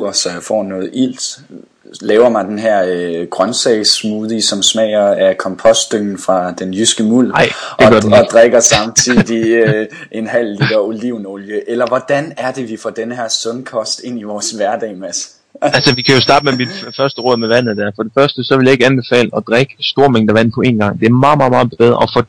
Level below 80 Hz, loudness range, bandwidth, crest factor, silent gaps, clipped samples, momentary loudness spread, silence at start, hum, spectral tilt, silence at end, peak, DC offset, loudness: -46 dBFS; 8 LU; 11 kHz; 12 dB; none; 0.2%; 12 LU; 0 s; none; -4 dB/octave; 0.05 s; 0 dBFS; under 0.1%; -12 LUFS